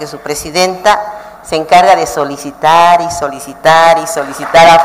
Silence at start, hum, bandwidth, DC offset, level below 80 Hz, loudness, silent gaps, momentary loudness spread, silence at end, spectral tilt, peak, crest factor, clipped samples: 0 s; none; 16 kHz; under 0.1%; -42 dBFS; -10 LUFS; none; 13 LU; 0 s; -3 dB/octave; 0 dBFS; 10 dB; 0.3%